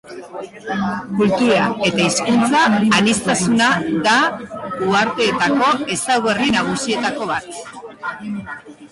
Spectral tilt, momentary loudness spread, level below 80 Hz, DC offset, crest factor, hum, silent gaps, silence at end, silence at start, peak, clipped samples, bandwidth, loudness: -4 dB/octave; 16 LU; -52 dBFS; under 0.1%; 14 dB; none; none; 0.05 s; 0.05 s; -4 dBFS; under 0.1%; 11.5 kHz; -16 LUFS